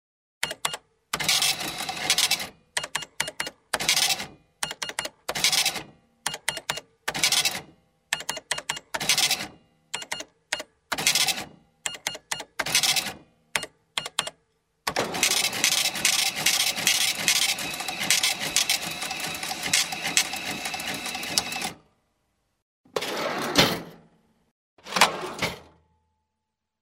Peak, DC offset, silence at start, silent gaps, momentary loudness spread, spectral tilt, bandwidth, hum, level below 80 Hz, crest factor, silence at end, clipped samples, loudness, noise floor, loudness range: 0 dBFS; under 0.1%; 0.4 s; 22.62-22.84 s, 24.51-24.77 s; 12 LU; 0 dB/octave; 16.5 kHz; none; -60 dBFS; 28 dB; 1.15 s; under 0.1%; -25 LUFS; -83 dBFS; 6 LU